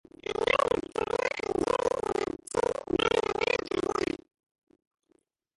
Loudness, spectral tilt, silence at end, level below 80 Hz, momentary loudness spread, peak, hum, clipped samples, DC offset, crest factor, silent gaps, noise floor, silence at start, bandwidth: -29 LUFS; -4 dB/octave; 1.4 s; -56 dBFS; 6 LU; -10 dBFS; none; under 0.1%; under 0.1%; 20 dB; none; -71 dBFS; 0.3 s; 11.5 kHz